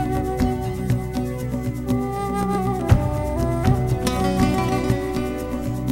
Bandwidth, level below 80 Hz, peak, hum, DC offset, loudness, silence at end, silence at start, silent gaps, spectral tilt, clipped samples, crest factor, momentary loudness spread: 16.5 kHz; -30 dBFS; -2 dBFS; none; under 0.1%; -22 LUFS; 0 s; 0 s; none; -7 dB/octave; under 0.1%; 20 dB; 7 LU